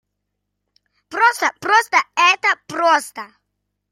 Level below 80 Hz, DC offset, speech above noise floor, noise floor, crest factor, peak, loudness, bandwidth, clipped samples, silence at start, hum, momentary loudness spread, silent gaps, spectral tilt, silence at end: -72 dBFS; under 0.1%; 59 dB; -76 dBFS; 18 dB; -2 dBFS; -16 LUFS; 16 kHz; under 0.1%; 1.1 s; 50 Hz at -65 dBFS; 13 LU; none; -1 dB/octave; 0.65 s